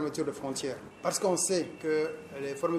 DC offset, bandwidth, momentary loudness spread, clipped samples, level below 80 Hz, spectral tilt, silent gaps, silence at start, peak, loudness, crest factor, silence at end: under 0.1%; 15.5 kHz; 10 LU; under 0.1%; -70 dBFS; -3.5 dB/octave; none; 0 s; -14 dBFS; -32 LUFS; 18 dB; 0 s